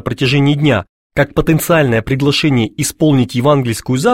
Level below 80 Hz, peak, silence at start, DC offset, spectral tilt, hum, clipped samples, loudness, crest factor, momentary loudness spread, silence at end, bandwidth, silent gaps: -36 dBFS; 0 dBFS; 0.05 s; 0.4%; -5.5 dB/octave; none; under 0.1%; -13 LUFS; 14 dB; 5 LU; 0 s; 16.5 kHz; 0.89-1.10 s